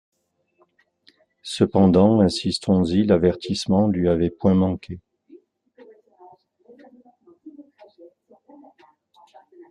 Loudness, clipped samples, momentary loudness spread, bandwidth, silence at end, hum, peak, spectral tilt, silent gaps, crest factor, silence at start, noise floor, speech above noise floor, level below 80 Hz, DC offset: -20 LUFS; under 0.1%; 16 LU; 10.5 kHz; 0.05 s; none; -4 dBFS; -7 dB/octave; none; 20 dB; 1.45 s; -67 dBFS; 48 dB; -54 dBFS; under 0.1%